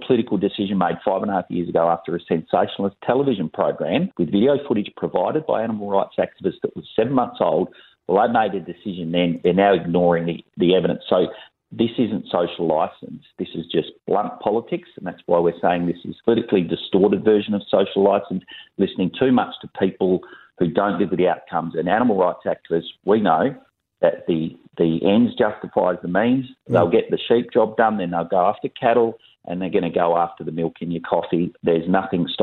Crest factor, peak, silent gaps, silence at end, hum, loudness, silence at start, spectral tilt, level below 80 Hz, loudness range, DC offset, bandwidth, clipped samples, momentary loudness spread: 18 dB; -2 dBFS; none; 0 s; none; -21 LUFS; 0 s; -10 dB/octave; -58 dBFS; 3 LU; under 0.1%; 4.3 kHz; under 0.1%; 8 LU